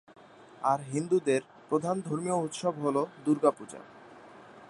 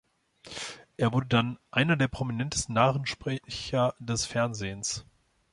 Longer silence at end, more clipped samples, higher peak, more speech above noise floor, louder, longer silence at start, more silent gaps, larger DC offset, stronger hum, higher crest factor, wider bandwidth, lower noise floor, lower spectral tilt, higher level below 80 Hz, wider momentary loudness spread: second, 0.05 s vs 0.5 s; neither; about the same, -8 dBFS vs -8 dBFS; about the same, 22 dB vs 24 dB; about the same, -30 LUFS vs -29 LUFS; about the same, 0.4 s vs 0.45 s; neither; neither; neither; about the same, 22 dB vs 20 dB; about the same, 11.5 kHz vs 11.5 kHz; about the same, -51 dBFS vs -52 dBFS; first, -6 dB/octave vs -4.5 dB/octave; second, -78 dBFS vs -54 dBFS; about the same, 12 LU vs 13 LU